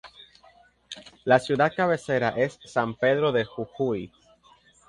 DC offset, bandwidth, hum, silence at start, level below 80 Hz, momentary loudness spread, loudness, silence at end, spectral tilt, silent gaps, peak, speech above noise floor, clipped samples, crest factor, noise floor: under 0.1%; 11.5 kHz; none; 0.05 s; -62 dBFS; 17 LU; -25 LUFS; 0.8 s; -6 dB/octave; none; -4 dBFS; 34 dB; under 0.1%; 22 dB; -58 dBFS